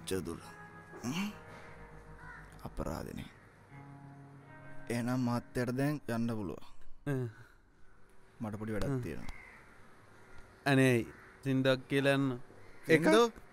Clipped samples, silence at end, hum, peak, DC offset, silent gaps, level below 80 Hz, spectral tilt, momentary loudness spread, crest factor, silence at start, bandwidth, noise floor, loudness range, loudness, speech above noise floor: under 0.1%; 0.05 s; none; -12 dBFS; under 0.1%; none; -54 dBFS; -6 dB/octave; 24 LU; 22 dB; 0 s; 16 kHz; -56 dBFS; 12 LU; -34 LUFS; 24 dB